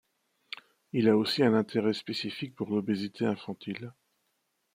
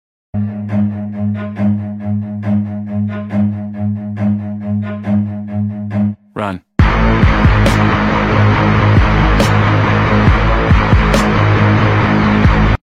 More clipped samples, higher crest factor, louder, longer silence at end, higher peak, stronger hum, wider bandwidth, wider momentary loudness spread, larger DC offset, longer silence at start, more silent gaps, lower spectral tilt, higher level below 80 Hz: neither; first, 20 dB vs 12 dB; second, -29 LUFS vs -14 LUFS; first, 0.85 s vs 0.1 s; second, -10 dBFS vs 0 dBFS; neither; first, 15.5 kHz vs 11.5 kHz; first, 19 LU vs 9 LU; neither; first, 0.95 s vs 0.35 s; neither; about the same, -6.5 dB/octave vs -7.5 dB/octave; second, -74 dBFS vs -20 dBFS